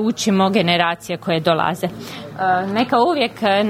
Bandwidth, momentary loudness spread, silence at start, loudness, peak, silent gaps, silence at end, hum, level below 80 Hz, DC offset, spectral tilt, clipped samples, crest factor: 16 kHz; 10 LU; 0 s; -18 LUFS; -2 dBFS; none; 0 s; none; -58 dBFS; under 0.1%; -5 dB/octave; under 0.1%; 16 dB